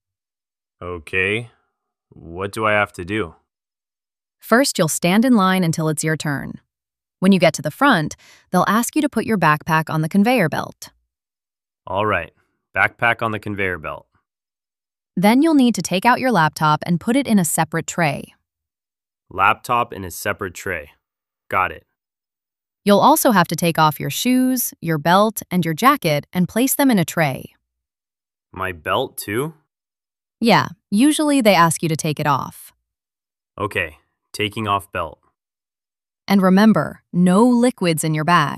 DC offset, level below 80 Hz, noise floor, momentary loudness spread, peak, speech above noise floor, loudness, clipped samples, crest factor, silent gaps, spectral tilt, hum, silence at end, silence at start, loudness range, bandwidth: under 0.1%; -56 dBFS; under -90 dBFS; 13 LU; 0 dBFS; over 72 dB; -18 LUFS; under 0.1%; 18 dB; none; -5 dB/octave; none; 0 s; 0.8 s; 6 LU; 15.5 kHz